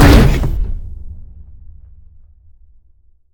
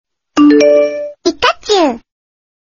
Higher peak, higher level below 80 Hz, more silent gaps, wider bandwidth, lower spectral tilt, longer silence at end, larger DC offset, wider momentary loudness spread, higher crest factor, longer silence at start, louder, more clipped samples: about the same, 0 dBFS vs 0 dBFS; first, -18 dBFS vs -50 dBFS; neither; first, 19.5 kHz vs 7.4 kHz; first, -6.5 dB/octave vs -3 dB/octave; first, 2.1 s vs 0.75 s; neither; first, 27 LU vs 11 LU; about the same, 14 dB vs 12 dB; second, 0 s vs 0.35 s; second, -14 LUFS vs -11 LUFS; first, 0.3% vs under 0.1%